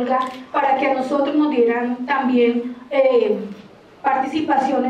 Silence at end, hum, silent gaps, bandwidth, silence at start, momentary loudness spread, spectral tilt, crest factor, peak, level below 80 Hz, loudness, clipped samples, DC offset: 0 s; none; none; 9 kHz; 0 s; 7 LU; -6 dB/octave; 14 dB; -4 dBFS; -66 dBFS; -19 LUFS; under 0.1%; under 0.1%